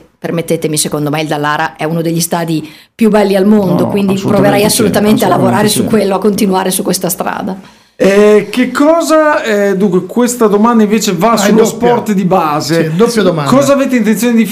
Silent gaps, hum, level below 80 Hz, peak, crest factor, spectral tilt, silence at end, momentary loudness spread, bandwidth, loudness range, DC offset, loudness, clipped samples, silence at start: none; none; -46 dBFS; 0 dBFS; 10 dB; -5 dB/octave; 0 s; 7 LU; 16 kHz; 2 LU; under 0.1%; -10 LUFS; 0.2%; 0.25 s